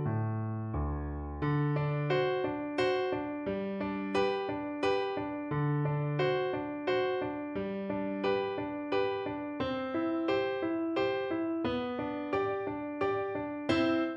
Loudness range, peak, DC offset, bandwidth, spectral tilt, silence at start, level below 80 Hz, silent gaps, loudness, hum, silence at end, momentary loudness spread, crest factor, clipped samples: 1 LU; -16 dBFS; under 0.1%; 9.2 kHz; -8 dB/octave; 0 s; -50 dBFS; none; -33 LUFS; none; 0 s; 6 LU; 16 dB; under 0.1%